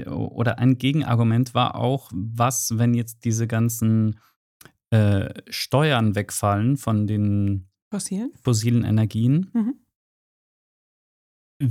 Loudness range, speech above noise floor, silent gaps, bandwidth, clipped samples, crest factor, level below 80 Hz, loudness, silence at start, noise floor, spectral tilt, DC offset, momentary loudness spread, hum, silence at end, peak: 2 LU; over 69 dB; 4.36-4.60 s, 7.82-7.91 s, 9.96-11.60 s; 15.5 kHz; under 0.1%; 16 dB; -58 dBFS; -22 LUFS; 0 s; under -90 dBFS; -6 dB/octave; under 0.1%; 9 LU; none; 0 s; -6 dBFS